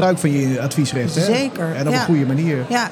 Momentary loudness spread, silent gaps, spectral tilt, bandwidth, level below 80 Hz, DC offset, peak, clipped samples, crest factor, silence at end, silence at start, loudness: 3 LU; none; -5.5 dB/octave; 17.5 kHz; -62 dBFS; under 0.1%; -4 dBFS; under 0.1%; 14 dB; 0 s; 0 s; -18 LUFS